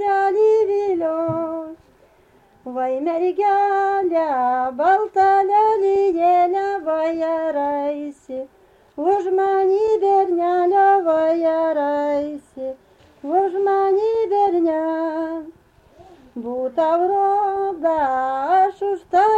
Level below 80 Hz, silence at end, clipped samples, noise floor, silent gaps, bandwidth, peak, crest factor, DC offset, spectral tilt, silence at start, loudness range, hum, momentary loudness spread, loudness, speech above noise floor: -60 dBFS; 0 s; under 0.1%; -54 dBFS; none; 8 kHz; -6 dBFS; 12 dB; under 0.1%; -6.5 dB/octave; 0 s; 4 LU; none; 14 LU; -19 LUFS; 35 dB